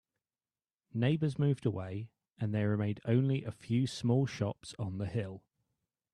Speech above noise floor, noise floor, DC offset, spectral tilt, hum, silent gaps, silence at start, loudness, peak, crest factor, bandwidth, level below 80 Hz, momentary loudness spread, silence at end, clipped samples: over 57 dB; under -90 dBFS; under 0.1%; -7.5 dB/octave; none; none; 0.95 s; -34 LUFS; -16 dBFS; 18 dB; 11 kHz; -68 dBFS; 11 LU; 0.75 s; under 0.1%